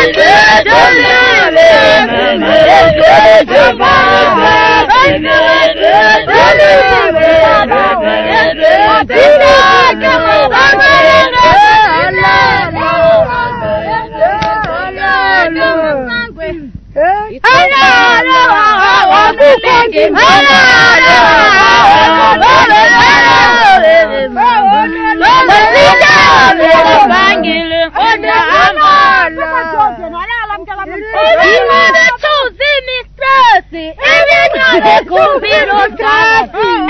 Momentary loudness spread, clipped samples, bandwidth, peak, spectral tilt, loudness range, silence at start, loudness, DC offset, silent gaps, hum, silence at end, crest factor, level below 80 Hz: 9 LU; 2%; 11 kHz; 0 dBFS; -3.5 dB/octave; 5 LU; 0 s; -6 LUFS; under 0.1%; none; none; 0 s; 6 dB; -34 dBFS